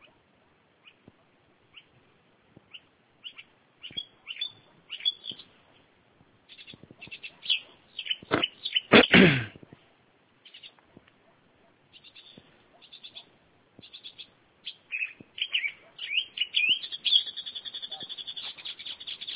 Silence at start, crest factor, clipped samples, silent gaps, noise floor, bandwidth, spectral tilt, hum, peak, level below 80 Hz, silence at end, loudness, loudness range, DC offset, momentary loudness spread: 2.75 s; 28 dB; under 0.1%; none; -65 dBFS; 4 kHz; -2 dB/octave; none; -4 dBFS; -60 dBFS; 0 s; -26 LUFS; 20 LU; under 0.1%; 26 LU